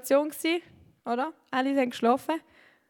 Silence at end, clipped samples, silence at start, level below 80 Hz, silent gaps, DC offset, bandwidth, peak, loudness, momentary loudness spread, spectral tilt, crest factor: 0.5 s; under 0.1%; 0.05 s; -76 dBFS; none; under 0.1%; 18.5 kHz; -10 dBFS; -28 LUFS; 8 LU; -3.5 dB/octave; 18 dB